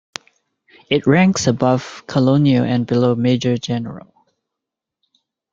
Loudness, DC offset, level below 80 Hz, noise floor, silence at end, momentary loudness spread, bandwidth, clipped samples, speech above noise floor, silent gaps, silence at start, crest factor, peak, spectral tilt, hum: -17 LUFS; under 0.1%; -54 dBFS; -83 dBFS; 1.55 s; 14 LU; 7.6 kHz; under 0.1%; 67 dB; none; 0.9 s; 18 dB; 0 dBFS; -6 dB/octave; none